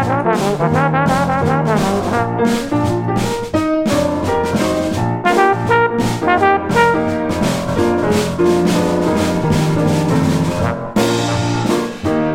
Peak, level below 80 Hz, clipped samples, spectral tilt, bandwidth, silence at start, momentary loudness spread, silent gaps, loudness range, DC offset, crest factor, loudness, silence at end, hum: 0 dBFS; -38 dBFS; under 0.1%; -6 dB/octave; 16.5 kHz; 0 s; 4 LU; none; 2 LU; under 0.1%; 14 dB; -15 LUFS; 0 s; none